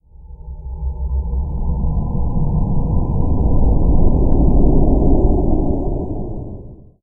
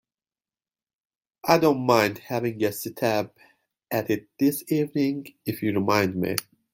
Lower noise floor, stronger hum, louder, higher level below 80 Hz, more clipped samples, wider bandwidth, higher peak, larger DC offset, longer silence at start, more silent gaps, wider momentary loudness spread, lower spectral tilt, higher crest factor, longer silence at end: second, -35 dBFS vs under -90 dBFS; neither; first, -19 LUFS vs -25 LUFS; first, -16 dBFS vs -66 dBFS; neither; second, 1.2 kHz vs 17 kHz; about the same, 0 dBFS vs -2 dBFS; neither; second, 0.2 s vs 1.45 s; neither; first, 14 LU vs 10 LU; first, -14.5 dB/octave vs -5.5 dB/octave; second, 14 dB vs 24 dB; about the same, 0.3 s vs 0.3 s